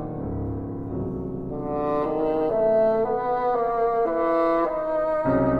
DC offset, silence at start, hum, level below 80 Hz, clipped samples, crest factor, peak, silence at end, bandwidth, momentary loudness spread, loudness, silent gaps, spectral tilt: under 0.1%; 0 s; none; -44 dBFS; under 0.1%; 14 dB; -10 dBFS; 0 s; 5.2 kHz; 10 LU; -24 LUFS; none; -10 dB/octave